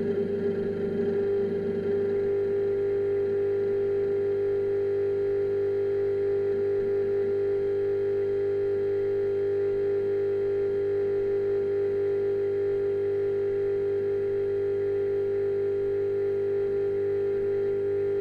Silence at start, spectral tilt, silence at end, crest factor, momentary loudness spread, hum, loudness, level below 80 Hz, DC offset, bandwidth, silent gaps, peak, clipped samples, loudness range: 0 s; -9 dB/octave; 0 s; 8 dB; 1 LU; 50 Hz at -45 dBFS; -27 LUFS; -56 dBFS; under 0.1%; 4.8 kHz; none; -18 dBFS; under 0.1%; 1 LU